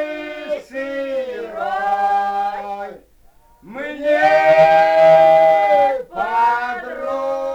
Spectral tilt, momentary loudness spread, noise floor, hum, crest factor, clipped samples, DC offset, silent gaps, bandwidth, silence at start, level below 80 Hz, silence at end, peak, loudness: -5 dB/octave; 17 LU; -50 dBFS; none; 14 dB; under 0.1%; under 0.1%; none; 8.6 kHz; 0 s; -54 dBFS; 0 s; -2 dBFS; -16 LUFS